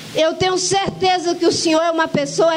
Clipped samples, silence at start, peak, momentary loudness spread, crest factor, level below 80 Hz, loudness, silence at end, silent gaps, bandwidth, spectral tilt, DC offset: under 0.1%; 0 s; -4 dBFS; 3 LU; 12 dB; -50 dBFS; -17 LUFS; 0 s; none; 16 kHz; -3.5 dB/octave; under 0.1%